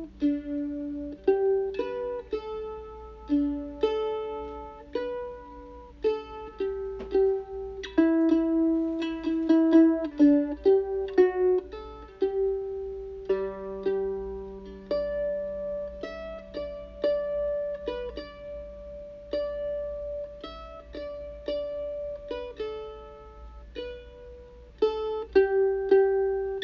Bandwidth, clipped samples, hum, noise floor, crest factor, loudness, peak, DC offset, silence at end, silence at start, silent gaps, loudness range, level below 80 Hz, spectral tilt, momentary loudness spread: 6.2 kHz; under 0.1%; none; -48 dBFS; 18 dB; -28 LUFS; -10 dBFS; under 0.1%; 0 s; 0 s; none; 13 LU; -50 dBFS; -7.5 dB/octave; 19 LU